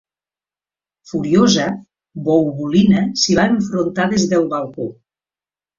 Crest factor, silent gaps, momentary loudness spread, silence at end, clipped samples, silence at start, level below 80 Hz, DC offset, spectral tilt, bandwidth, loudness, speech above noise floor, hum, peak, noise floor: 16 dB; none; 13 LU; 0.85 s; under 0.1%; 1.1 s; -50 dBFS; under 0.1%; -5 dB/octave; 7.6 kHz; -16 LUFS; over 74 dB; none; -2 dBFS; under -90 dBFS